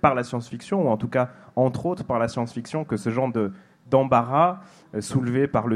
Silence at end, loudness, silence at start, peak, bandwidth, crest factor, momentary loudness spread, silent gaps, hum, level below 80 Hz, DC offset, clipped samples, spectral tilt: 0 s; -24 LUFS; 0.05 s; -4 dBFS; 12 kHz; 20 dB; 10 LU; none; none; -56 dBFS; under 0.1%; under 0.1%; -7 dB/octave